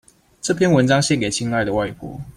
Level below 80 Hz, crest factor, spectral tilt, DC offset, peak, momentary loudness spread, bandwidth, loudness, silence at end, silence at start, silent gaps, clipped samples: -48 dBFS; 16 dB; -5 dB/octave; under 0.1%; -4 dBFS; 12 LU; 15.5 kHz; -19 LUFS; 0.05 s; 0.45 s; none; under 0.1%